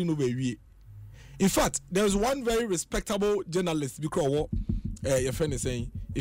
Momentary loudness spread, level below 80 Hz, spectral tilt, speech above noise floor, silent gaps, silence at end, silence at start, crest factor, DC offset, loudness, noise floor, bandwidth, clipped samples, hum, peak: 9 LU; -42 dBFS; -5 dB/octave; 20 dB; none; 0 s; 0 s; 14 dB; under 0.1%; -28 LUFS; -47 dBFS; 16 kHz; under 0.1%; none; -16 dBFS